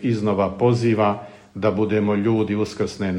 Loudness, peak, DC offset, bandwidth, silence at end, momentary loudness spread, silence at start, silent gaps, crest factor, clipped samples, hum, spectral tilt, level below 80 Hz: -21 LUFS; -6 dBFS; under 0.1%; 11 kHz; 0 s; 6 LU; 0 s; none; 14 dB; under 0.1%; none; -7.5 dB/octave; -54 dBFS